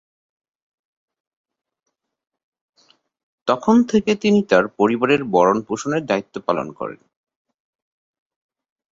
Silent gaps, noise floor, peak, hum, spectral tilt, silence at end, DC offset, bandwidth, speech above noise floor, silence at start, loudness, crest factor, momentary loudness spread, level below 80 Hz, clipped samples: none; -59 dBFS; -2 dBFS; none; -6 dB/octave; 1.95 s; under 0.1%; 7.8 kHz; 41 dB; 3.45 s; -18 LUFS; 20 dB; 10 LU; -60 dBFS; under 0.1%